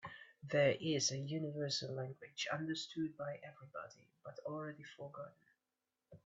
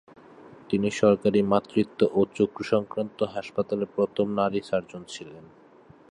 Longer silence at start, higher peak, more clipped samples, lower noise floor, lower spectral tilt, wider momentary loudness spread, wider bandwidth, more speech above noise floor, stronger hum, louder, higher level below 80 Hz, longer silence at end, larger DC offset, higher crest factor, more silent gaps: second, 0 s vs 0.7 s; second, -22 dBFS vs -6 dBFS; neither; first, under -90 dBFS vs -53 dBFS; second, -4 dB/octave vs -6.5 dB/octave; first, 19 LU vs 12 LU; second, 8.2 kHz vs 10.5 kHz; first, over 49 dB vs 28 dB; neither; second, -40 LUFS vs -26 LUFS; second, -82 dBFS vs -62 dBFS; second, 0.1 s vs 0.7 s; neither; about the same, 22 dB vs 20 dB; neither